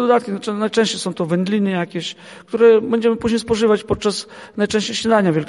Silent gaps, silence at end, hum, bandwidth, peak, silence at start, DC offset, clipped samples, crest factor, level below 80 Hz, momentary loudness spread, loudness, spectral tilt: none; 0 s; none; 11.5 kHz; -2 dBFS; 0 s; under 0.1%; under 0.1%; 16 dB; -48 dBFS; 13 LU; -18 LUFS; -5 dB/octave